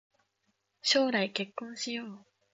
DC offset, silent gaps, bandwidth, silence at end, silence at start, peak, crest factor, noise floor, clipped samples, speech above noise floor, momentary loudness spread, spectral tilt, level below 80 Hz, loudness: under 0.1%; none; 8 kHz; 0.35 s; 0.85 s; -12 dBFS; 20 dB; -78 dBFS; under 0.1%; 47 dB; 13 LU; -2.5 dB/octave; -82 dBFS; -31 LUFS